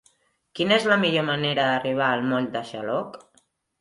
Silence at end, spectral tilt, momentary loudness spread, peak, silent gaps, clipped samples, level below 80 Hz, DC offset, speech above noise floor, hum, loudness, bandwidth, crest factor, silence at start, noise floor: 0.65 s; -5.5 dB/octave; 10 LU; -6 dBFS; none; under 0.1%; -68 dBFS; under 0.1%; 41 dB; none; -23 LUFS; 11.5 kHz; 18 dB; 0.55 s; -65 dBFS